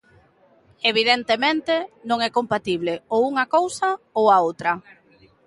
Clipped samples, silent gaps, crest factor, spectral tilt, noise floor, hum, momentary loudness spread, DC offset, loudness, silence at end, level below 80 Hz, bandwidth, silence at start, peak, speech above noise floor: under 0.1%; none; 18 dB; -3.5 dB/octave; -57 dBFS; none; 8 LU; under 0.1%; -21 LUFS; 0.65 s; -64 dBFS; 11.5 kHz; 0.85 s; -4 dBFS; 36 dB